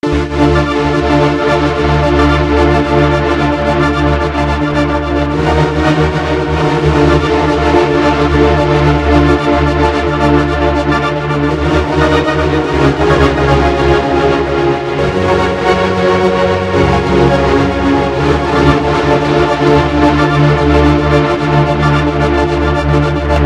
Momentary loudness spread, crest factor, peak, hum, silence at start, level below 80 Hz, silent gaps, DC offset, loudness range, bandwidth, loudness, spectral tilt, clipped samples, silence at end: 3 LU; 10 dB; 0 dBFS; none; 0.05 s; -20 dBFS; none; under 0.1%; 2 LU; 10.5 kHz; -11 LUFS; -7 dB/octave; 0.2%; 0 s